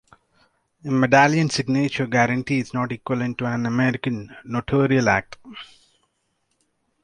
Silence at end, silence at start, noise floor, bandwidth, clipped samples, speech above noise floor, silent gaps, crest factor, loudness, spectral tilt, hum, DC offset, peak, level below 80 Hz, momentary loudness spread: 1.4 s; 0.85 s; -71 dBFS; 10.5 kHz; under 0.1%; 50 dB; none; 22 dB; -21 LUFS; -6 dB/octave; none; under 0.1%; 0 dBFS; -54 dBFS; 16 LU